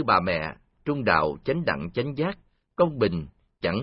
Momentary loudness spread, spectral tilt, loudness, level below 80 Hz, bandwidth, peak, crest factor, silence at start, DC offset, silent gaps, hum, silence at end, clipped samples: 13 LU; -10.5 dB/octave; -26 LUFS; -50 dBFS; 5.6 kHz; -6 dBFS; 20 dB; 0 s; under 0.1%; none; none; 0 s; under 0.1%